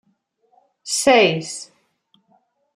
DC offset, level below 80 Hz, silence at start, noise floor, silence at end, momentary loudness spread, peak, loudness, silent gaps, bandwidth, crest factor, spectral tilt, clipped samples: under 0.1%; -64 dBFS; 0.85 s; -66 dBFS; 1.1 s; 24 LU; -2 dBFS; -16 LUFS; none; 14 kHz; 20 dB; -3 dB/octave; under 0.1%